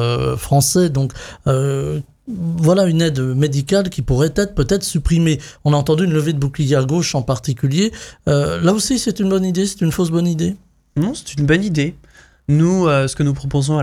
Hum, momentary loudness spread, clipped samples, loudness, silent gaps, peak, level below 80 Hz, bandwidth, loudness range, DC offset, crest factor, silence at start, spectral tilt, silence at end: none; 7 LU; under 0.1%; -17 LUFS; none; -2 dBFS; -34 dBFS; 16 kHz; 1 LU; under 0.1%; 14 dB; 0 s; -6 dB/octave; 0 s